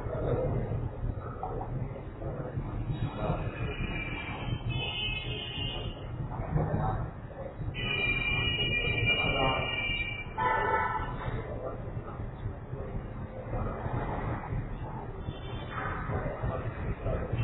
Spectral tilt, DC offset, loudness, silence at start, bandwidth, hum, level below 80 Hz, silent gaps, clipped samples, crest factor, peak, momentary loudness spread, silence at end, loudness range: -9 dB/octave; under 0.1%; -33 LUFS; 0 s; 4.1 kHz; none; -40 dBFS; none; under 0.1%; 18 dB; -16 dBFS; 12 LU; 0 s; 9 LU